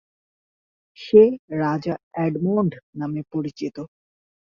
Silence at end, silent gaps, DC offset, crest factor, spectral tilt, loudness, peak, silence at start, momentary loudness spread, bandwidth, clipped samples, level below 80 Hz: 0.55 s; 1.39-1.48 s, 2.03-2.11 s, 2.83-2.93 s; under 0.1%; 20 dB; -8.5 dB/octave; -22 LUFS; -2 dBFS; 1 s; 17 LU; 6.8 kHz; under 0.1%; -62 dBFS